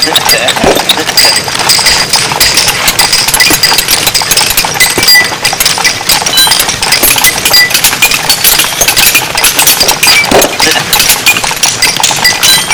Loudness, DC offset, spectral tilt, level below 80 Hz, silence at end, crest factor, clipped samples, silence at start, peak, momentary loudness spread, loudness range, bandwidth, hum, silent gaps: -4 LUFS; under 0.1%; -0.5 dB/octave; -30 dBFS; 0 s; 6 dB; 5%; 0 s; 0 dBFS; 3 LU; 1 LU; over 20 kHz; none; none